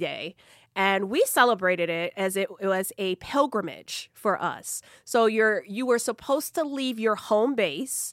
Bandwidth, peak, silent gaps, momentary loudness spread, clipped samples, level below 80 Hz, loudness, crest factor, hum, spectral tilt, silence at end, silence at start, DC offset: 16.5 kHz; -6 dBFS; none; 12 LU; under 0.1%; -68 dBFS; -26 LUFS; 20 dB; none; -3 dB/octave; 0 s; 0 s; under 0.1%